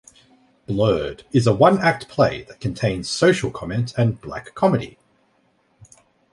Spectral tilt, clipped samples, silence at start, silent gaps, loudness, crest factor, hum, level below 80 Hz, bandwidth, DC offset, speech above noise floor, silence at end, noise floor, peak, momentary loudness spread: -6 dB/octave; under 0.1%; 0.7 s; none; -20 LUFS; 20 dB; none; -48 dBFS; 11.5 kHz; under 0.1%; 43 dB; 1.4 s; -63 dBFS; -2 dBFS; 13 LU